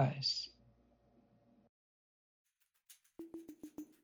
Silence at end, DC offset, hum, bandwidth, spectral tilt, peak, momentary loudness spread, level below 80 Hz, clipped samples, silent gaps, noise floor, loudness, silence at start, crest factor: 0.2 s; under 0.1%; none; over 20 kHz; -5 dB/octave; -22 dBFS; 19 LU; -80 dBFS; under 0.1%; 1.69-2.45 s; -71 dBFS; -40 LUFS; 0 s; 24 dB